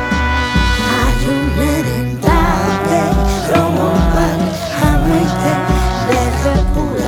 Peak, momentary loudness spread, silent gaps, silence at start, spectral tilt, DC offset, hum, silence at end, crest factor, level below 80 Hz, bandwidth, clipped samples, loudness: 0 dBFS; 3 LU; none; 0 s; -6 dB/octave; under 0.1%; none; 0 s; 14 dB; -20 dBFS; 18 kHz; under 0.1%; -14 LUFS